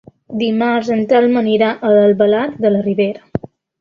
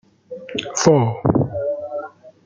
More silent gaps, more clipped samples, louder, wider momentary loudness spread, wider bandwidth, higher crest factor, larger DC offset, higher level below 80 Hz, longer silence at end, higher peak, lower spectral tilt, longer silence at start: neither; neither; first, -14 LUFS vs -19 LUFS; second, 12 LU vs 21 LU; second, 7 kHz vs 9.4 kHz; second, 12 dB vs 18 dB; neither; about the same, -52 dBFS vs -50 dBFS; first, 0.35 s vs 0.15 s; about the same, -2 dBFS vs -2 dBFS; first, -7.5 dB/octave vs -5.5 dB/octave; about the same, 0.3 s vs 0.3 s